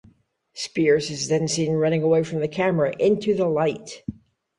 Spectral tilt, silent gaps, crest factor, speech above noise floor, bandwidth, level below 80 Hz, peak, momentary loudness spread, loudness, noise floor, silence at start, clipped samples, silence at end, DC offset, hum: -5.5 dB/octave; none; 16 dB; 37 dB; 11.5 kHz; -58 dBFS; -8 dBFS; 14 LU; -22 LUFS; -59 dBFS; 0.55 s; under 0.1%; 0.45 s; under 0.1%; none